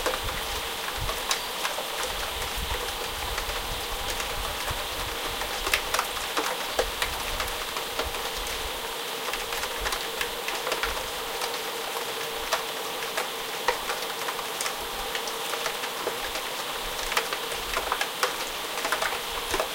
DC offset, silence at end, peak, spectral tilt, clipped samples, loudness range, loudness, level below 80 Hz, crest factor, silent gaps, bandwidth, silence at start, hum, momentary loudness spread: under 0.1%; 0 s; -4 dBFS; -1 dB/octave; under 0.1%; 2 LU; -29 LUFS; -44 dBFS; 26 dB; none; 17 kHz; 0 s; none; 3 LU